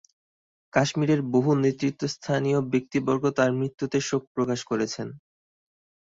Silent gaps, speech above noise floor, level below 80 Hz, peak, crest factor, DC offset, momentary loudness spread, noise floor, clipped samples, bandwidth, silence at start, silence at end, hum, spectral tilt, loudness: 4.27-4.35 s; over 65 dB; -64 dBFS; -6 dBFS; 20 dB; under 0.1%; 6 LU; under -90 dBFS; under 0.1%; 7.8 kHz; 0.75 s; 0.85 s; none; -6 dB/octave; -25 LUFS